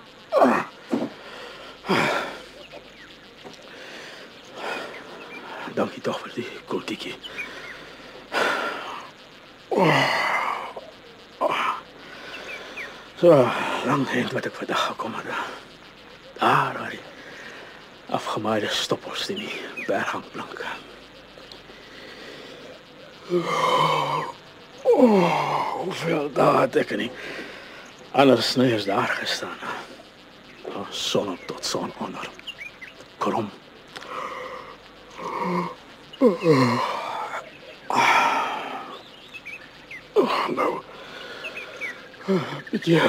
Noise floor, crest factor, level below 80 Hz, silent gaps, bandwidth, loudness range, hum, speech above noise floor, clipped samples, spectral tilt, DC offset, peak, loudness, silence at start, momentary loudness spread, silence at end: -47 dBFS; 22 dB; -64 dBFS; none; 16 kHz; 10 LU; none; 24 dB; under 0.1%; -5 dB/octave; under 0.1%; -4 dBFS; -24 LUFS; 0 s; 23 LU; 0 s